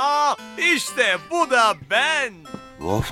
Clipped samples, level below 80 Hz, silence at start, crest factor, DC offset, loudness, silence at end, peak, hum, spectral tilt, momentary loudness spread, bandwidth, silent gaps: under 0.1%; -48 dBFS; 0 s; 18 dB; under 0.1%; -20 LUFS; 0 s; -4 dBFS; none; -3 dB/octave; 12 LU; 17.5 kHz; none